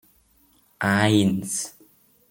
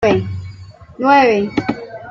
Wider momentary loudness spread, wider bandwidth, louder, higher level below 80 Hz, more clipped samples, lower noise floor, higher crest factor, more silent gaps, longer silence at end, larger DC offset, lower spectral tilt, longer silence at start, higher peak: second, 10 LU vs 18 LU; first, 17 kHz vs 7.4 kHz; second, -22 LUFS vs -15 LUFS; second, -62 dBFS vs -48 dBFS; neither; first, -61 dBFS vs -36 dBFS; first, 20 dB vs 14 dB; neither; first, 0.6 s vs 0 s; neither; second, -4.5 dB/octave vs -6.5 dB/octave; first, 0.8 s vs 0 s; about the same, -4 dBFS vs -2 dBFS